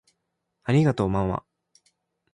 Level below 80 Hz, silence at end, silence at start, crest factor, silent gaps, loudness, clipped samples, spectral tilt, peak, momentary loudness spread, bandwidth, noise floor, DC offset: -48 dBFS; 0.95 s; 0.65 s; 16 dB; none; -24 LUFS; under 0.1%; -8 dB/octave; -10 dBFS; 13 LU; 10.5 kHz; -79 dBFS; under 0.1%